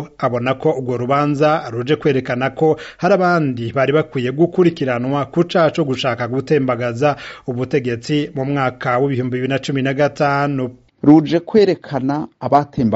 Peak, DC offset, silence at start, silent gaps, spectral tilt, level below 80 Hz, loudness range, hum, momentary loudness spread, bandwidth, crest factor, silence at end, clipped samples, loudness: 0 dBFS; under 0.1%; 0 s; none; -6 dB/octave; -52 dBFS; 3 LU; none; 6 LU; 8 kHz; 16 dB; 0 s; under 0.1%; -17 LUFS